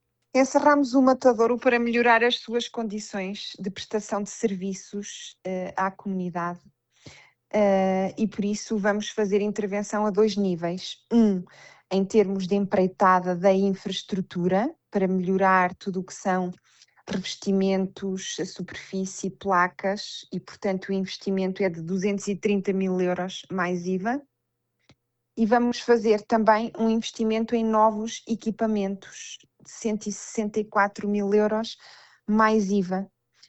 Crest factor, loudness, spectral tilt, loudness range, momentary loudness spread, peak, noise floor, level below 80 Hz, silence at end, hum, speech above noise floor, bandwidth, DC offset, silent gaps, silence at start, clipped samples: 18 dB; -25 LUFS; -5.5 dB/octave; 6 LU; 12 LU; -6 dBFS; -79 dBFS; -64 dBFS; 0.45 s; none; 54 dB; 8.4 kHz; under 0.1%; none; 0.35 s; under 0.1%